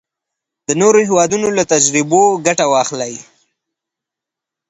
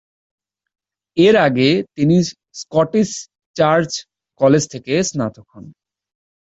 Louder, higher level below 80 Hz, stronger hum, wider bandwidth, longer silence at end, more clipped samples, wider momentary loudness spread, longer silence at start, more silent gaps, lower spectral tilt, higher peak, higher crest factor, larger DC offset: first, -13 LUFS vs -16 LUFS; about the same, -58 dBFS vs -54 dBFS; neither; about the same, 8.8 kHz vs 8.2 kHz; first, 1.5 s vs 0.8 s; neither; about the same, 12 LU vs 13 LU; second, 0.7 s vs 1.15 s; second, none vs 3.46-3.54 s; second, -3.5 dB/octave vs -5.5 dB/octave; about the same, 0 dBFS vs -2 dBFS; about the same, 16 dB vs 16 dB; neither